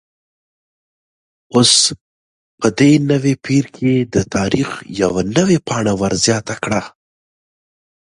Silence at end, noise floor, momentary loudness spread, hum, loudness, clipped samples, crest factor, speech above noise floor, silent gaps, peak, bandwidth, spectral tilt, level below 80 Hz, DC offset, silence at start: 1.15 s; under -90 dBFS; 9 LU; none; -15 LUFS; under 0.1%; 18 dB; over 75 dB; 2.01-2.58 s; 0 dBFS; 11.5 kHz; -4 dB/octave; -46 dBFS; under 0.1%; 1.55 s